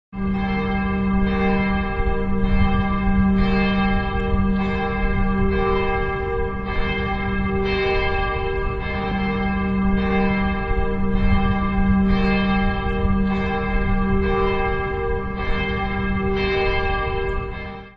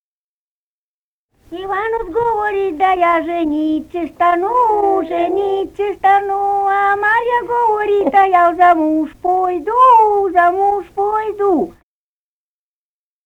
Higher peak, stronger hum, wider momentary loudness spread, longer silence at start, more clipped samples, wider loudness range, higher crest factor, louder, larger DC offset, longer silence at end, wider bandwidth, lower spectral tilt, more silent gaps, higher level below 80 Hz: second, -6 dBFS vs -2 dBFS; neither; second, 5 LU vs 8 LU; second, 0.1 s vs 1.5 s; neither; second, 2 LU vs 5 LU; about the same, 14 dB vs 14 dB; second, -22 LUFS vs -15 LUFS; neither; second, 0.05 s vs 1.55 s; second, 5.6 kHz vs 9.8 kHz; first, -9 dB/octave vs -6 dB/octave; neither; first, -26 dBFS vs -48 dBFS